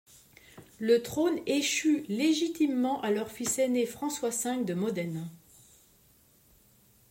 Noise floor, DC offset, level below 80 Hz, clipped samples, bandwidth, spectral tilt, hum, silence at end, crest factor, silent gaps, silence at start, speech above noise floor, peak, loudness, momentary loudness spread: -63 dBFS; under 0.1%; -68 dBFS; under 0.1%; 16.5 kHz; -4 dB/octave; none; 1.75 s; 18 dB; none; 0.55 s; 34 dB; -12 dBFS; -29 LUFS; 7 LU